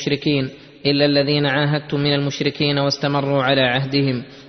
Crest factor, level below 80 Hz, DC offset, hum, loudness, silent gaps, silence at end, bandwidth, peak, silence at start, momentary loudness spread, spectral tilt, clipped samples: 16 dB; -54 dBFS; under 0.1%; none; -18 LUFS; none; 0 s; 6.4 kHz; -2 dBFS; 0 s; 6 LU; -6 dB/octave; under 0.1%